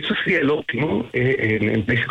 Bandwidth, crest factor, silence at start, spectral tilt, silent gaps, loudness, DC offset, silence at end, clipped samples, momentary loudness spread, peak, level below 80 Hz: 8.4 kHz; 12 dB; 0 s; -7.5 dB/octave; none; -20 LUFS; under 0.1%; 0 s; under 0.1%; 4 LU; -8 dBFS; -50 dBFS